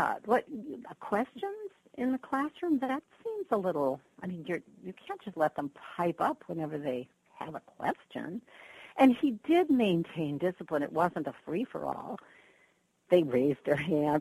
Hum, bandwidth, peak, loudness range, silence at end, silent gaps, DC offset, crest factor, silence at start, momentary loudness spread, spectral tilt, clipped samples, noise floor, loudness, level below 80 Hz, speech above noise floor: none; 13 kHz; -12 dBFS; 6 LU; 0 s; none; under 0.1%; 20 dB; 0 s; 17 LU; -7.5 dB/octave; under 0.1%; -69 dBFS; -32 LUFS; -72 dBFS; 38 dB